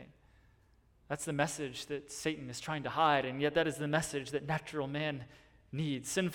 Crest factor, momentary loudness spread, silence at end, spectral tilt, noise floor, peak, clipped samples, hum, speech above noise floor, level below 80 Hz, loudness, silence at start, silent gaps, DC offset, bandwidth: 22 dB; 11 LU; 0 s; -4.5 dB/octave; -67 dBFS; -14 dBFS; under 0.1%; none; 32 dB; -64 dBFS; -35 LUFS; 0 s; none; under 0.1%; 18 kHz